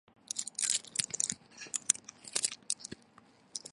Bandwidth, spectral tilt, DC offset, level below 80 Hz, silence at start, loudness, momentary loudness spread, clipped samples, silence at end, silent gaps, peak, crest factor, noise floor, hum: 12 kHz; 1 dB/octave; under 0.1%; -78 dBFS; 0.35 s; -34 LUFS; 14 LU; under 0.1%; 0 s; none; -6 dBFS; 32 dB; -62 dBFS; none